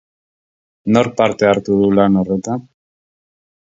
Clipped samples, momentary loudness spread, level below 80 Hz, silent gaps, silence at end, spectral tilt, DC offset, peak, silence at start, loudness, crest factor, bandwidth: under 0.1%; 12 LU; -50 dBFS; none; 1.1 s; -7 dB/octave; under 0.1%; 0 dBFS; 0.85 s; -15 LUFS; 18 dB; 7.8 kHz